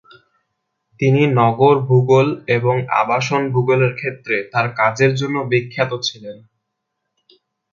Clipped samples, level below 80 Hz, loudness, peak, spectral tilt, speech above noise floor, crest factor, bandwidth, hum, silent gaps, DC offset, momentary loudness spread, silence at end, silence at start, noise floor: under 0.1%; -58 dBFS; -17 LUFS; 0 dBFS; -6.5 dB/octave; 60 dB; 18 dB; 7.4 kHz; none; none; under 0.1%; 8 LU; 1.35 s; 1 s; -76 dBFS